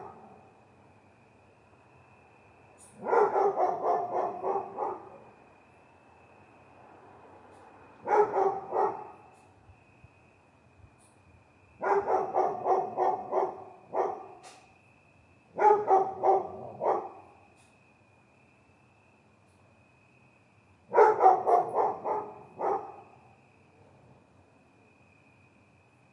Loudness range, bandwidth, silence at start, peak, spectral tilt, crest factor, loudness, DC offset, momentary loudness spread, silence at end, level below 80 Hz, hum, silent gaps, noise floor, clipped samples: 12 LU; 11 kHz; 0 s; -8 dBFS; -6.5 dB/octave; 24 dB; -28 LUFS; under 0.1%; 21 LU; 3.1 s; -76 dBFS; none; none; -62 dBFS; under 0.1%